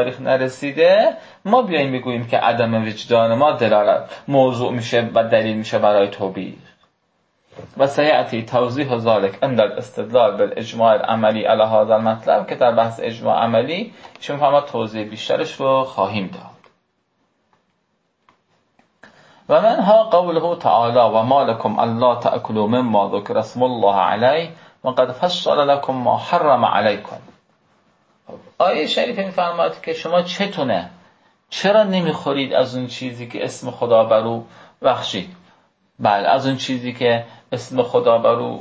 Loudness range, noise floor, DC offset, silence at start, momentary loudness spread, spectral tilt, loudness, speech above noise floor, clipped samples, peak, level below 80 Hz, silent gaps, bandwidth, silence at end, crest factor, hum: 5 LU; -68 dBFS; under 0.1%; 0 s; 11 LU; -6 dB/octave; -18 LUFS; 50 dB; under 0.1%; -2 dBFS; -62 dBFS; none; 8 kHz; 0 s; 16 dB; none